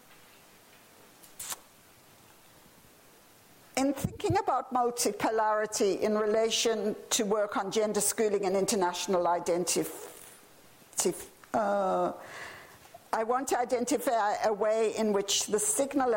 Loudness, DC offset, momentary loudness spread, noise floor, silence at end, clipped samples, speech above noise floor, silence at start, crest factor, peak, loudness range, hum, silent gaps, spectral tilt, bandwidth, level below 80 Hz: -29 LUFS; under 0.1%; 12 LU; -58 dBFS; 0 s; under 0.1%; 29 dB; 0.1 s; 18 dB; -12 dBFS; 9 LU; none; none; -3 dB/octave; 16.5 kHz; -64 dBFS